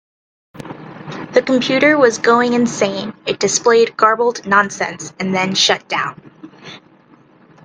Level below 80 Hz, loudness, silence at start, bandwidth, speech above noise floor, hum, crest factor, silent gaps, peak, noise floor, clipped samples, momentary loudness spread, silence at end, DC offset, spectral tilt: -60 dBFS; -15 LUFS; 0.55 s; 10 kHz; 33 dB; none; 16 dB; none; 0 dBFS; -48 dBFS; under 0.1%; 20 LU; 0.85 s; under 0.1%; -3 dB/octave